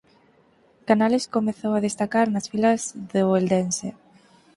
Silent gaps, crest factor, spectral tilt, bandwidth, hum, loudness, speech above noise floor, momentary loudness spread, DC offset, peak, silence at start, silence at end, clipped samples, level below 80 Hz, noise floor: none; 20 dB; -5.5 dB/octave; 11.5 kHz; none; -23 LUFS; 37 dB; 7 LU; under 0.1%; -4 dBFS; 0.85 s; 0.65 s; under 0.1%; -64 dBFS; -59 dBFS